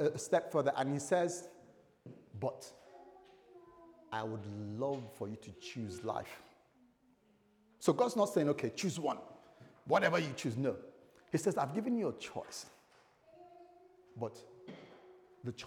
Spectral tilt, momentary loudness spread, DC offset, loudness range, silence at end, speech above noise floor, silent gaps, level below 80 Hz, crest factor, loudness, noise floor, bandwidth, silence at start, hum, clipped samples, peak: -5.5 dB/octave; 24 LU; under 0.1%; 10 LU; 0 s; 35 dB; none; -80 dBFS; 22 dB; -37 LUFS; -70 dBFS; 19.5 kHz; 0 s; none; under 0.1%; -16 dBFS